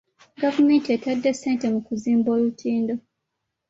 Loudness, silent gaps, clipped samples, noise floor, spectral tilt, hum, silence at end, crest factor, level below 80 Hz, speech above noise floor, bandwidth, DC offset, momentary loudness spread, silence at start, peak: -22 LUFS; none; under 0.1%; -80 dBFS; -5.5 dB/octave; none; 0.7 s; 14 dB; -66 dBFS; 59 dB; 7.8 kHz; under 0.1%; 7 LU; 0.4 s; -8 dBFS